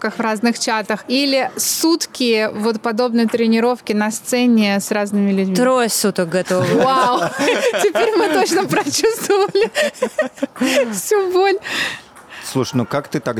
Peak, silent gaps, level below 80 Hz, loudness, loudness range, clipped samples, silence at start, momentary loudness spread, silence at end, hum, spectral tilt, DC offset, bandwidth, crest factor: -6 dBFS; none; -62 dBFS; -17 LUFS; 2 LU; under 0.1%; 0 s; 6 LU; 0 s; none; -4 dB/octave; under 0.1%; 19.5 kHz; 10 dB